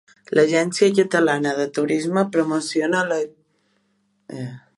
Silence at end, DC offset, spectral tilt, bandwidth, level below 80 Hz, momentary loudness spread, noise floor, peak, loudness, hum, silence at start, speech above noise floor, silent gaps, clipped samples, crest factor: 0.2 s; under 0.1%; -5 dB/octave; 11.5 kHz; -70 dBFS; 15 LU; -67 dBFS; -2 dBFS; -20 LUFS; none; 0.3 s; 47 dB; none; under 0.1%; 18 dB